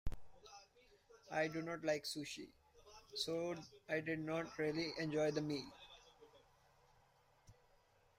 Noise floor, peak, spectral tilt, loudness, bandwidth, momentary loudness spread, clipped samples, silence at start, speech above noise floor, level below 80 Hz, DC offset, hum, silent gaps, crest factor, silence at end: -73 dBFS; -26 dBFS; -4.5 dB/octave; -43 LUFS; 16 kHz; 21 LU; under 0.1%; 0.05 s; 31 dB; -62 dBFS; under 0.1%; none; none; 20 dB; 0.65 s